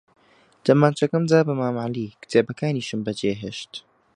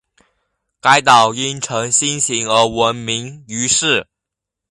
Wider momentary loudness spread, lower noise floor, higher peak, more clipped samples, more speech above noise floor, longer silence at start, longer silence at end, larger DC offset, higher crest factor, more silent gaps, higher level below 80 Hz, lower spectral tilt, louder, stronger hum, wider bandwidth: first, 14 LU vs 10 LU; second, -51 dBFS vs -83 dBFS; about the same, -2 dBFS vs 0 dBFS; neither; second, 29 dB vs 67 dB; second, 0.65 s vs 0.85 s; second, 0.35 s vs 0.65 s; neither; first, 22 dB vs 16 dB; neither; second, -62 dBFS vs -52 dBFS; first, -6.5 dB/octave vs -2 dB/octave; second, -22 LUFS vs -14 LUFS; neither; about the same, 10.5 kHz vs 11.5 kHz